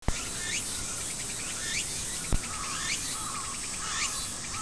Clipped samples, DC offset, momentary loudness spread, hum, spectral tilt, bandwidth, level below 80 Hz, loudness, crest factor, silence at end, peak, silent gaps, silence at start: under 0.1%; 0.4%; 3 LU; none; -1 dB/octave; 11 kHz; -42 dBFS; -31 LUFS; 22 dB; 0 s; -10 dBFS; none; 0 s